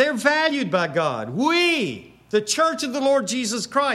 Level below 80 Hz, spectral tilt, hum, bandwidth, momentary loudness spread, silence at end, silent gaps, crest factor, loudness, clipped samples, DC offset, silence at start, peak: -66 dBFS; -3 dB/octave; none; 15 kHz; 6 LU; 0 s; none; 18 dB; -21 LUFS; under 0.1%; under 0.1%; 0 s; -4 dBFS